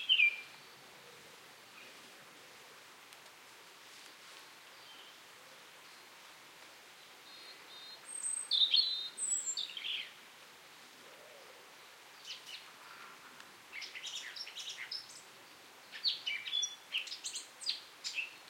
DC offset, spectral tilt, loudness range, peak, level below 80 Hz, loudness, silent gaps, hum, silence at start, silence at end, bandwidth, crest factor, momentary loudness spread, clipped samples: under 0.1%; 3 dB/octave; 19 LU; -16 dBFS; under -90 dBFS; -35 LUFS; none; none; 0 s; 0 s; 16.5 kHz; 26 dB; 21 LU; under 0.1%